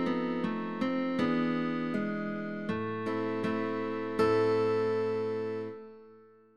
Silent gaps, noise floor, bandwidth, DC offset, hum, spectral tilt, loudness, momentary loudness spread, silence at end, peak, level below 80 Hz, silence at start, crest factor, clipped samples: none; -57 dBFS; 9.6 kHz; 0.2%; none; -7.5 dB/octave; -31 LUFS; 8 LU; 0 s; -16 dBFS; -68 dBFS; 0 s; 16 dB; under 0.1%